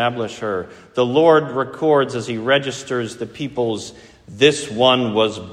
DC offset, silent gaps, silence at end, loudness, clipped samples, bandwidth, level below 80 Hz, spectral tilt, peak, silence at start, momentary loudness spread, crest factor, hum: under 0.1%; none; 0 s; -18 LUFS; under 0.1%; 11.5 kHz; -58 dBFS; -4.5 dB/octave; 0 dBFS; 0 s; 13 LU; 18 dB; none